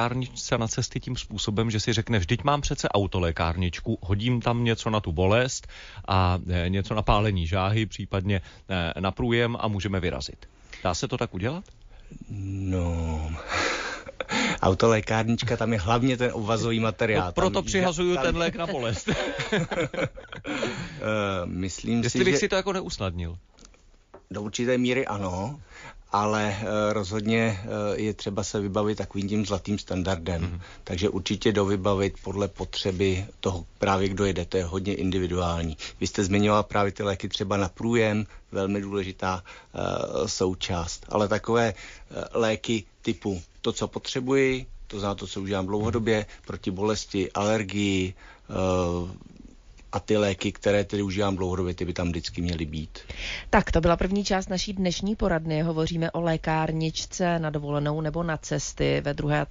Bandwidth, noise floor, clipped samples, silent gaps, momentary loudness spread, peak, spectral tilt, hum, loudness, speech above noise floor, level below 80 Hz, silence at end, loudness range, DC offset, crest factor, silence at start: 7.6 kHz; -54 dBFS; under 0.1%; none; 9 LU; -8 dBFS; -5.5 dB/octave; none; -27 LUFS; 28 dB; -42 dBFS; 0 s; 4 LU; under 0.1%; 18 dB; 0 s